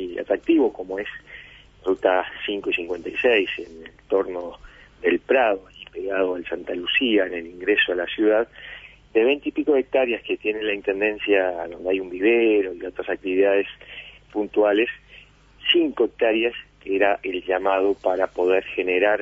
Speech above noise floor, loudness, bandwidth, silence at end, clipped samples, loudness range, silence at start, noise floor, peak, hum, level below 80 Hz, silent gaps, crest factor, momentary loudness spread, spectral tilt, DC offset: 27 dB; -22 LUFS; 7.2 kHz; 0 s; under 0.1%; 3 LU; 0 s; -49 dBFS; -4 dBFS; none; -56 dBFS; none; 18 dB; 13 LU; -5.5 dB/octave; under 0.1%